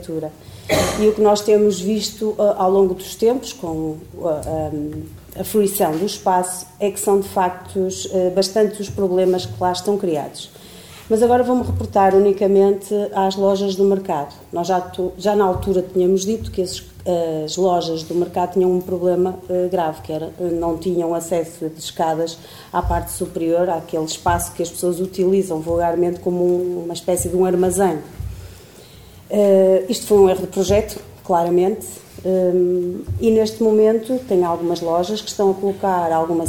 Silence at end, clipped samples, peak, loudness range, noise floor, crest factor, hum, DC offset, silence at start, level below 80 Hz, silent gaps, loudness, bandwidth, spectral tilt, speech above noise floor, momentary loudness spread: 0 s; under 0.1%; -2 dBFS; 5 LU; -42 dBFS; 16 dB; none; 0.1%; 0 s; -42 dBFS; none; -19 LUFS; 18 kHz; -5.5 dB/octave; 24 dB; 11 LU